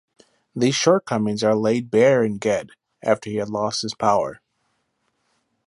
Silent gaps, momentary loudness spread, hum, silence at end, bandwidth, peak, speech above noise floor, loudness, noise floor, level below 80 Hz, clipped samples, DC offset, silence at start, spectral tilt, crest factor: none; 9 LU; none; 1.35 s; 11.5 kHz; -2 dBFS; 51 dB; -21 LUFS; -71 dBFS; -62 dBFS; under 0.1%; under 0.1%; 0.55 s; -5 dB/octave; 20 dB